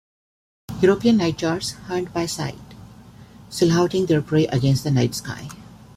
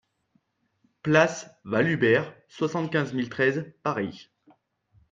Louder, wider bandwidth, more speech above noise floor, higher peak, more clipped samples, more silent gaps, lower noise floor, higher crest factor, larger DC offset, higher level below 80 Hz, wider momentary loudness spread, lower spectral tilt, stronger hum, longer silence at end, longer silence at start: first, -21 LUFS vs -25 LUFS; first, 16 kHz vs 7.8 kHz; second, 24 dB vs 45 dB; about the same, -4 dBFS vs -4 dBFS; neither; neither; second, -44 dBFS vs -70 dBFS; about the same, 18 dB vs 22 dB; neither; first, -50 dBFS vs -66 dBFS; first, 16 LU vs 13 LU; about the same, -6 dB/octave vs -6 dB/octave; neither; second, 0.2 s vs 0.9 s; second, 0.7 s vs 1.05 s